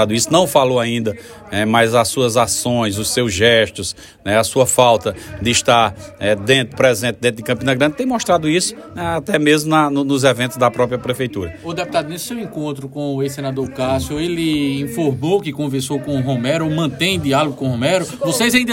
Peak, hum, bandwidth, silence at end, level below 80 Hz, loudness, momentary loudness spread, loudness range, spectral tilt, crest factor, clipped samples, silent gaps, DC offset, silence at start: 0 dBFS; none; 16.5 kHz; 0 s; -48 dBFS; -17 LUFS; 11 LU; 6 LU; -4 dB/octave; 16 dB; under 0.1%; none; under 0.1%; 0 s